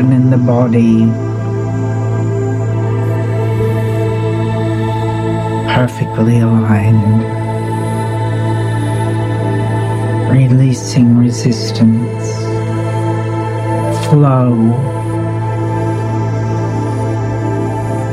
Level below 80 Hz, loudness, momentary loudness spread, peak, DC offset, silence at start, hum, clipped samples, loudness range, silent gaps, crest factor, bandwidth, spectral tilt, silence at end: -38 dBFS; -14 LUFS; 7 LU; 0 dBFS; under 0.1%; 0 s; none; under 0.1%; 3 LU; none; 12 dB; 11.5 kHz; -7.5 dB/octave; 0 s